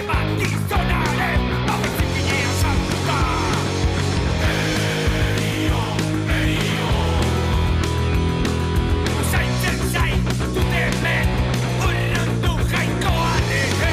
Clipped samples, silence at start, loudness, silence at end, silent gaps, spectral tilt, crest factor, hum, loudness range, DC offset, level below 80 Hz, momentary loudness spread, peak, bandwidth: under 0.1%; 0 s; -20 LUFS; 0 s; none; -5 dB/octave; 10 dB; none; 0 LU; under 0.1%; -28 dBFS; 2 LU; -10 dBFS; 16 kHz